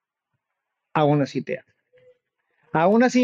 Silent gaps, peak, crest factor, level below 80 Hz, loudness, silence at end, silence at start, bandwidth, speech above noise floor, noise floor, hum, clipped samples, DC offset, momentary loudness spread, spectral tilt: none; -8 dBFS; 16 dB; -68 dBFS; -22 LUFS; 0 s; 0.95 s; 7.8 kHz; 62 dB; -81 dBFS; none; under 0.1%; under 0.1%; 14 LU; -6.5 dB/octave